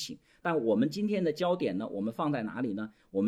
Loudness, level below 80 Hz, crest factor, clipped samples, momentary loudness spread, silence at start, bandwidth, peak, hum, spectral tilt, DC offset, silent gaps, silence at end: -32 LUFS; -72 dBFS; 14 dB; under 0.1%; 8 LU; 0 s; 15 kHz; -16 dBFS; none; -6.5 dB/octave; under 0.1%; none; 0 s